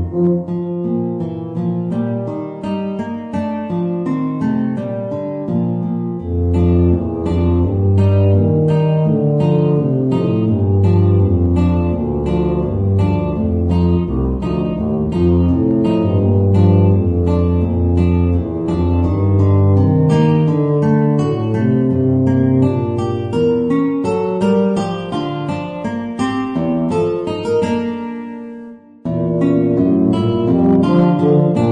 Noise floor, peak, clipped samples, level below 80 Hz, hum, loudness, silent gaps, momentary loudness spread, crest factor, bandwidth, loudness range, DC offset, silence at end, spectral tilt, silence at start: -35 dBFS; -2 dBFS; under 0.1%; -32 dBFS; none; -16 LUFS; none; 9 LU; 14 dB; 8.8 kHz; 6 LU; under 0.1%; 0 s; -9.5 dB/octave; 0 s